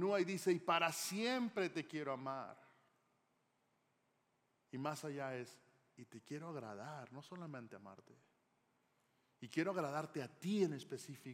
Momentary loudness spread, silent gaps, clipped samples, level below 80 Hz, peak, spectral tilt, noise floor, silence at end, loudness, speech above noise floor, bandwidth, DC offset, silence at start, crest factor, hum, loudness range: 17 LU; none; under 0.1%; under -90 dBFS; -22 dBFS; -4.5 dB/octave; -82 dBFS; 0 s; -42 LUFS; 39 dB; 16 kHz; under 0.1%; 0 s; 22 dB; none; 12 LU